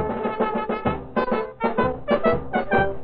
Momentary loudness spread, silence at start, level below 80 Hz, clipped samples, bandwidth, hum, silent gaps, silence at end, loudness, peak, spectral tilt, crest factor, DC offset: 4 LU; 0 s; -42 dBFS; under 0.1%; 5.2 kHz; none; none; 0 s; -24 LUFS; -6 dBFS; -5 dB/octave; 16 dB; under 0.1%